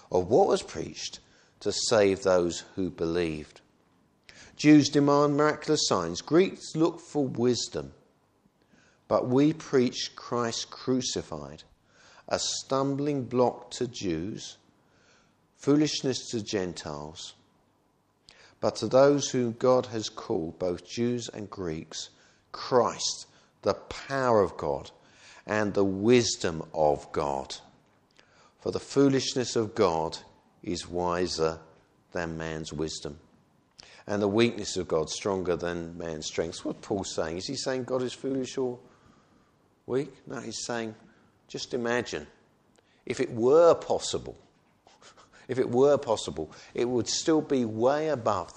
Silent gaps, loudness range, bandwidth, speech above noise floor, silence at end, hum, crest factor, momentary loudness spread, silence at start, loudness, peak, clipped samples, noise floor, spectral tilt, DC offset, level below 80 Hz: none; 7 LU; 10 kHz; 41 dB; 0.05 s; none; 20 dB; 15 LU; 0.1 s; -28 LUFS; -8 dBFS; under 0.1%; -69 dBFS; -4.5 dB/octave; under 0.1%; -60 dBFS